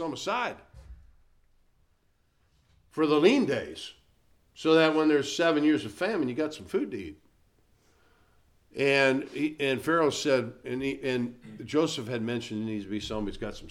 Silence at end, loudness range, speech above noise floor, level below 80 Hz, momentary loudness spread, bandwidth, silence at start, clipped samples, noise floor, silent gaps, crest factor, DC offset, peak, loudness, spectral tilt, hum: 0 s; 6 LU; 42 dB; -56 dBFS; 15 LU; 14 kHz; 0 s; under 0.1%; -69 dBFS; none; 22 dB; under 0.1%; -8 dBFS; -27 LUFS; -5 dB/octave; none